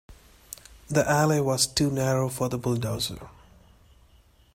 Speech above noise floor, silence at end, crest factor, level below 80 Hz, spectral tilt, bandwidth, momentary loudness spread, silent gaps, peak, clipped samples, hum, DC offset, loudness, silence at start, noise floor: 33 dB; 1.25 s; 18 dB; -52 dBFS; -4.5 dB/octave; 16 kHz; 21 LU; none; -8 dBFS; under 0.1%; none; under 0.1%; -25 LUFS; 0.1 s; -58 dBFS